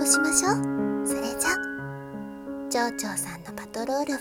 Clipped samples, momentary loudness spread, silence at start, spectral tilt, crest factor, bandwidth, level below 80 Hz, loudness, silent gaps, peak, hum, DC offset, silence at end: under 0.1%; 16 LU; 0 s; -3 dB/octave; 22 dB; 17.5 kHz; -56 dBFS; -26 LUFS; none; -6 dBFS; none; under 0.1%; 0 s